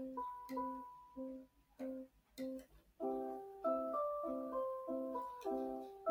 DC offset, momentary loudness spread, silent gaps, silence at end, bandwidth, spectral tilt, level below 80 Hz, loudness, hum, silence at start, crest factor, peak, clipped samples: under 0.1%; 11 LU; none; 0 s; 16 kHz; -6 dB/octave; -74 dBFS; -44 LUFS; none; 0 s; 16 dB; -28 dBFS; under 0.1%